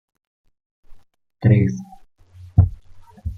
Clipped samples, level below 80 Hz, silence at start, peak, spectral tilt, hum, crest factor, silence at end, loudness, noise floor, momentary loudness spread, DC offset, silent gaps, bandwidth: under 0.1%; -38 dBFS; 0.9 s; -2 dBFS; -9.5 dB/octave; none; 20 dB; 0 s; -19 LUFS; -47 dBFS; 15 LU; under 0.1%; none; 6.6 kHz